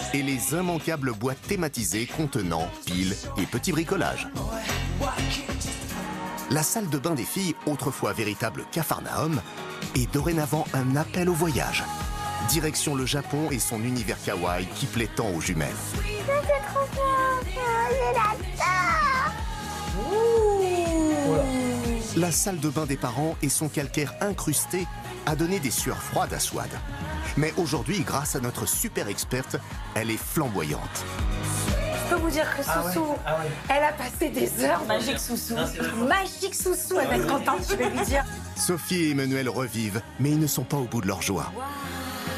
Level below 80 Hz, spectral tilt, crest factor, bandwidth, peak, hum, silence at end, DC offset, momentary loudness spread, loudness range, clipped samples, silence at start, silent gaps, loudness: -40 dBFS; -4 dB/octave; 18 dB; 15 kHz; -8 dBFS; none; 0 s; under 0.1%; 7 LU; 4 LU; under 0.1%; 0 s; none; -26 LUFS